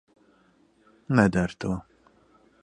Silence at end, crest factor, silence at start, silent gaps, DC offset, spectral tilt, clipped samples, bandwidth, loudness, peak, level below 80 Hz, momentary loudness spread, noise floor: 0.8 s; 26 dB; 1.1 s; none; under 0.1%; -7.5 dB/octave; under 0.1%; 10.5 kHz; -25 LUFS; -4 dBFS; -50 dBFS; 11 LU; -62 dBFS